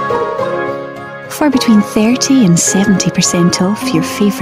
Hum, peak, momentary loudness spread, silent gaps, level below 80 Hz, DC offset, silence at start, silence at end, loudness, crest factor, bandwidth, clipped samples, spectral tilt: none; 0 dBFS; 11 LU; none; -46 dBFS; under 0.1%; 0 s; 0 s; -12 LUFS; 12 dB; 16 kHz; under 0.1%; -4.5 dB/octave